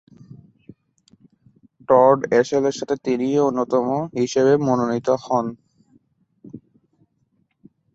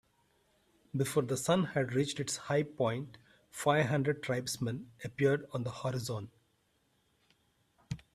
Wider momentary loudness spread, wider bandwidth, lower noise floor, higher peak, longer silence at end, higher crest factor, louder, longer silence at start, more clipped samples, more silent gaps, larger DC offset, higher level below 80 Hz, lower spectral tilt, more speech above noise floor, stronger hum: second, 8 LU vs 13 LU; second, 8 kHz vs 15.5 kHz; second, -67 dBFS vs -75 dBFS; first, -2 dBFS vs -14 dBFS; first, 1.35 s vs 0.15 s; about the same, 20 dB vs 20 dB; first, -19 LUFS vs -34 LUFS; first, 1.9 s vs 0.95 s; neither; neither; neither; about the same, -64 dBFS vs -68 dBFS; about the same, -6 dB/octave vs -5 dB/octave; first, 48 dB vs 42 dB; neither